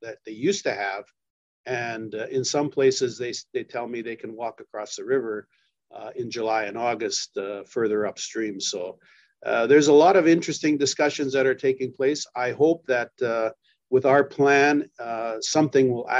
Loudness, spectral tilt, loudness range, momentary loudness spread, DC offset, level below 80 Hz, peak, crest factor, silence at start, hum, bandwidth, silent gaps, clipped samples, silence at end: -23 LUFS; -4 dB/octave; 8 LU; 15 LU; under 0.1%; -74 dBFS; -6 dBFS; 18 dB; 0 s; none; 8.2 kHz; 1.30-1.64 s; under 0.1%; 0 s